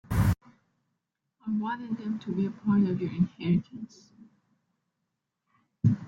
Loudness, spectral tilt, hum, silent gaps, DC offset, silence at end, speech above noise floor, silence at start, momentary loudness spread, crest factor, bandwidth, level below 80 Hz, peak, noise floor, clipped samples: -29 LUFS; -8.5 dB/octave; none; none; under 0.1%; 0 s; 54 dB; 0.1 s; 15 LU; 20 dB; 16.5 kHz; -48 dBFS; -10 dBFS; -83 dBFS; under 0.1%